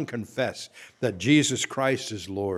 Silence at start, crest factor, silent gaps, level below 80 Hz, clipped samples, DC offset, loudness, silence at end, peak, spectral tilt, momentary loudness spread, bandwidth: 0 s; 20 dB; none; -66 dBFS; under 0.1%; under 0.1%; -26 LUFS; 0 s; -6 dBFS; -4 dB/octave; 12 LU; 14 kHz